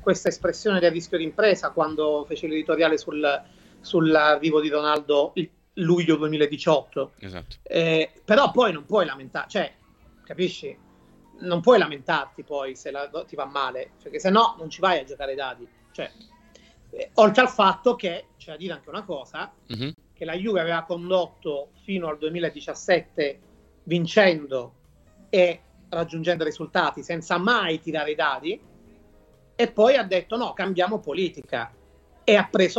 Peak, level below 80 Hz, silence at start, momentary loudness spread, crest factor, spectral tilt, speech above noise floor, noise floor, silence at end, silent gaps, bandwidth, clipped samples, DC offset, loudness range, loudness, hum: -2 dBFS; -58 dBFS; 0 s; 16 LU; 22 dB; -5 dB/octave; 32 dB; -55 dBFS; 0 s; none; 8.2 kHz; under 0.1%; under 0.1%; 5 LU; -23 LUFS; none